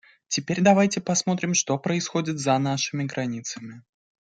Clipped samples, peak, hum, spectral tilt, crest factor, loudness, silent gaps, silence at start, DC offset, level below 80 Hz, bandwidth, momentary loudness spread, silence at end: under 0.1%; -4 dBFS; none; -4 dB/octave; 20 dB; -24 LUFS; none; 0.3 s; under 0.1%; -66 dBFS; 9.4 kHz; 12 LU; 0.5 s